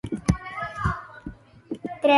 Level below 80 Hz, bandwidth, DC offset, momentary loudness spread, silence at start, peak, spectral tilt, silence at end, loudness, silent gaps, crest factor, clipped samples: -40 dBFS; 11.5 kHz; under 0.1%; 15 LU; 0.05 s; -6 dBFS; -6 dB/octave; 0 s; -29 LUFS; none; 20 dB; under 0.1%